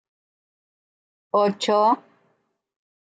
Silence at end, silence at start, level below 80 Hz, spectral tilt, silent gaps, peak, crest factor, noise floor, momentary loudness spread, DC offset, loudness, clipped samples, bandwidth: 1.15 s; 1.35 s; -82 dBFS; -5 dB/octave; none; -8 dBFS; 18 dB; -70 dBFS; 6 LU; under 0.1%; -21 LUFS; under 0.1%; 9.4 kHz